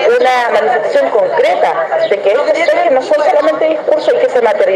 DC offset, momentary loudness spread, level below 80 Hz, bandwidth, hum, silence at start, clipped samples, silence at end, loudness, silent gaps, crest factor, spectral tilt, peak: under 0.1%; 3 LU; -64 dBFS; 10.5 kHz; none; 0 s; under 0.1%; 0 s; -11 LUFS; none; 10 dB; -3.5 dB/octave; 0 dBFS